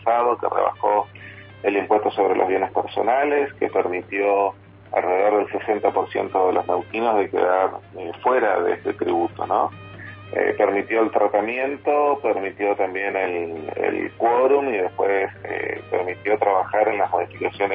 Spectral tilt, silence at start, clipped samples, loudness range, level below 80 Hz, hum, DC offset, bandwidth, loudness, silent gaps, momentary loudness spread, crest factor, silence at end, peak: -9 dB/octave; 0 s; under 0.1%; 1 LU; -64 dBFS; none; under 0.1%; 4.9 kHz; -21 LUFS; none; 7 LU; 18 dB; 0 s; -4 dBFS